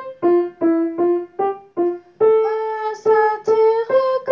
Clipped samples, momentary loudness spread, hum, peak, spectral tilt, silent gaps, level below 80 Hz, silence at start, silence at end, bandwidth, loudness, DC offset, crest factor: under 0.1%; 7 LU; none; -4 dBFS; -6.5 dB/octave; none; -70 dBFS; 0 s; 0 s; 6.8 kHz; -18 LUFS; under 0.1%; 14 dB